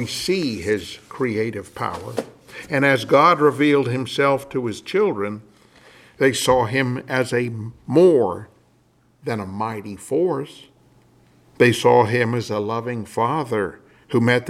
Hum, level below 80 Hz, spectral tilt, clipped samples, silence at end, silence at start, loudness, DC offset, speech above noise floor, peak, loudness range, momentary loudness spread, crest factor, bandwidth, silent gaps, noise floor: none; -56 dBFS; -5.5 dB/octave; under 0.1%; 0 s; 0 s; -20 LUFS; under 0.1%; 39 dB; -2 dBFS; 4 LU; 14 LU; 20 dB; 15.5 kHz; none; -59 dBFS